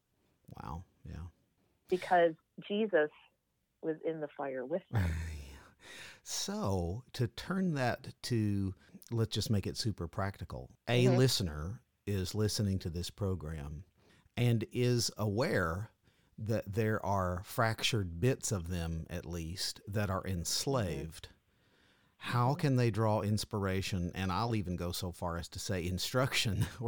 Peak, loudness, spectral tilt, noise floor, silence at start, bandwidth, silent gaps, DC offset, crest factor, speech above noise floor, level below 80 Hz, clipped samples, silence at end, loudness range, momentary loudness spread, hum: -16 dBFS; -35 LUFS; -5 dB/octave; -80 dBFS; 0.5 s; 19 kHz; none; under 0.1%; 18 dB; 46 dB; -54 dBFS; under 0.1%; 0 s; 4 LU; 15 LU; none